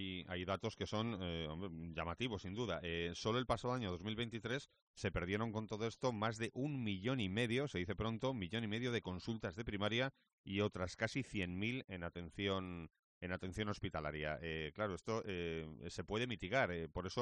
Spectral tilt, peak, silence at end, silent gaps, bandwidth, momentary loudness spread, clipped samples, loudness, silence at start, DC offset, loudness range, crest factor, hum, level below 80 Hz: -5.5 dB/octave; -22 dBFS; 0 s; 4.82-4.94 s, 10.33-10.44 s, 12.99-13.21 s; 9.4 kHz; 7 LU; under 0.1%; -42 LUFS; 0 s; under 0.1%; 3 LU; 20 dB; none; -62 dBFS